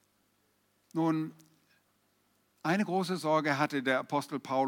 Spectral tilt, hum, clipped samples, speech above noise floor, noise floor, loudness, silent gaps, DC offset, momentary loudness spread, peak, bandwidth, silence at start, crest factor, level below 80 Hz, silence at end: -6 dB/octave; 50 Hz at -60 dBFS; under 0.1%; 42 dB; -73 dBFS; -32 LUFS; none; under 0.1%; 7 LU; -14 dBFS; 17.5 kHz; 0.95 s; 18 dB; -86 dBFS; 0 s